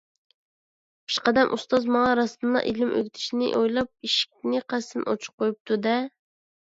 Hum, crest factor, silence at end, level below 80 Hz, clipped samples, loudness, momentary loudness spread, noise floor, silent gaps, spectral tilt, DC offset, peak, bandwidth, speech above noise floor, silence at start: none; 22 dB; 0.6 s; -62 dBFS; under 0.1%; -25 LUFS; 8 LU; under -90 dBFS; 5.33-5.38 s, 5.60-5.65 s; -4 dB/octave; under 0.1%; -4 dBFS; 7.8 kHz; over 66 dB; 1.1 s